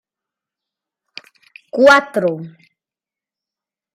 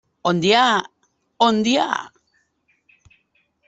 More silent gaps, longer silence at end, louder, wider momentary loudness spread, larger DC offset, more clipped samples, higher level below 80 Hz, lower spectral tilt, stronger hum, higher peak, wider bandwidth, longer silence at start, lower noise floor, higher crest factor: neither; about the same, 1.5 s vs 1.6 s; first, -13 LUFS vs -18 LUFS; first, 19 LU vs 8 LU; neither; neither; about the same, -64 dBFS vs -64 dBFS; about the same, -4.5 dB/octave vs -4 dB/octave; neither; about the same, 0 dBFS vs -2 dBFS; first, 14 kHz vs 8.2 kHz; first, 1.75 s vs 0.25 s; first, -89 dBFS vs -66 dBFS; about the same, 20 dB vs 20 dB